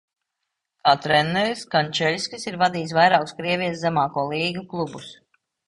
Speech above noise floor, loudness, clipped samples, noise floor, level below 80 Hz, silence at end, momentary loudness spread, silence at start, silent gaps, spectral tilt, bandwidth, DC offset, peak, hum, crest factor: 59 dB; -22 LUFS; under 0.1%; -81 dBFS; -60 dBFS; 0.55 s; 11 LU; 0.85 s; none; -4.5 dB/octave; 11.5 kHz; under 0.1%; -2 dBFS; none; 20 dB